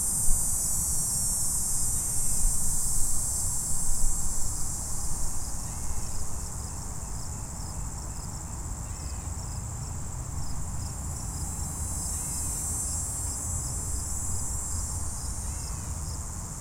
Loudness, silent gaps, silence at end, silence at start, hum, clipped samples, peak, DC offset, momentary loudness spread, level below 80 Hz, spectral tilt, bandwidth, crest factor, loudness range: -30 LUFS; none; 0 s; 0 s; none; under 0.1%; -8 dBFS; under 0.1%; 11 LU; -34 dBFS; -3 dB/octave; 16.5 kHz; 20 dB; 10 LU